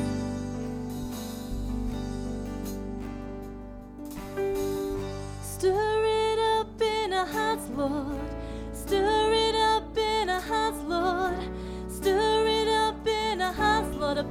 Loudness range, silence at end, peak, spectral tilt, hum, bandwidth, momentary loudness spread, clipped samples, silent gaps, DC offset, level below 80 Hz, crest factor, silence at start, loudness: 8 LU; 0 s; -12 dBFS; -4.5 dB/octave; none; 16.5 kHz; 13 LU; under 0.1%; none; under 0.1%; -42 dBFS; 16 dB; 0 s; -28 LUFS